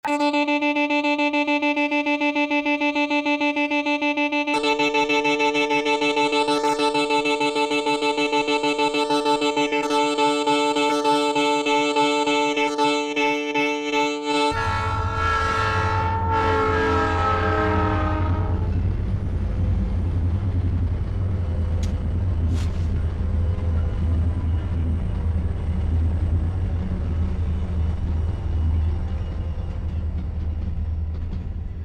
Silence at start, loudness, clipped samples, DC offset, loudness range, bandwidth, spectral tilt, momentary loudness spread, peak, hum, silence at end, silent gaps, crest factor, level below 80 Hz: 0.05 s; -22 LUFS; under 0.1%; under 0.1%; 5 LU; 10.5 kHz; -5.5 dB/octave; 6 LU; -8 dBFS; none; 0 s; none; 14 dB; -32 dBFS